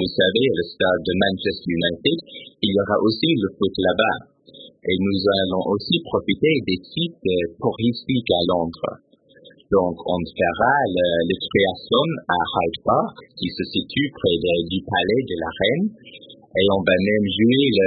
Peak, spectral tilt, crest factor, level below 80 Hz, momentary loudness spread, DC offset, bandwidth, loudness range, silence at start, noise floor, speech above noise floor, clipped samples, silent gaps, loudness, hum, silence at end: -4 dBFS; -10.5 dB/octave; 18 dB; -50 dBFS; 7 LU; under 0.1%; 5 kHz; 2 LU; 0 s; -50 dBFS; 30 dB; under 0.1%; none; -21 LUFS; none; 0 s